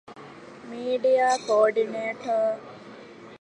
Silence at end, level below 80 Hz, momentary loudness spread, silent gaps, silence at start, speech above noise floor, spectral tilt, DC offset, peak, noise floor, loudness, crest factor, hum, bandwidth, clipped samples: 0.05 s; -74 dBFS; 23 LU; none; 0.1 s; 21 dB; -3.5 dB/octave; under 0.1%; -8 dBFS; -45 dBFS; -24 LUFS; 18 dB; none; 10.5 kHz; under 0.1%